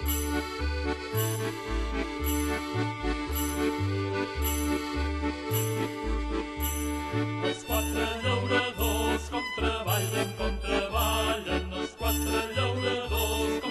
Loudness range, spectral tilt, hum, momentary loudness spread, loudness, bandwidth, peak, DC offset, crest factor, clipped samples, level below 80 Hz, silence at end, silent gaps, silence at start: 2 LU; -4.5 dB/octave; none; 5 LU; -29 LUFS; 12.5 kHz; -14 dBFS; under 0.1%; 16 dB; under 0.1%; -36 dBFS; 0 s; none; 0 s